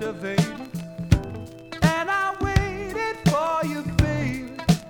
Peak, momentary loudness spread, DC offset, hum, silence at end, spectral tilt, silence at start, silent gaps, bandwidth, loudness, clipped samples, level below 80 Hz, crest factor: -2 dBFS; 12 LU; under 0.1%; none; 0 s; -6 dB/octave; 0 s; none; 19 kHz; -24 LUFS; under 0.1%; -36 dBFS; 22 dB